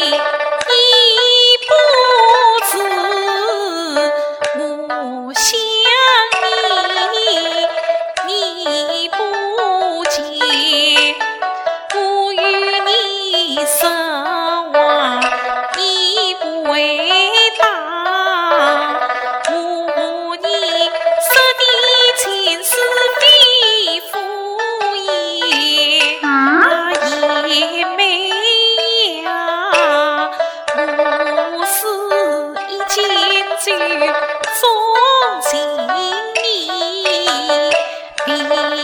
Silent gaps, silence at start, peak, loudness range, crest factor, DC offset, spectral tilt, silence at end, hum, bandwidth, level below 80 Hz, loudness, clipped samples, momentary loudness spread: none; 0 s; 0 dBFS; 5 LU; 14 dB; under 0.1%; 1 dB/octave; 0 s; none; 19 kHz; -60 dBFS; -13 LUFS; under 0.1%; 9 LU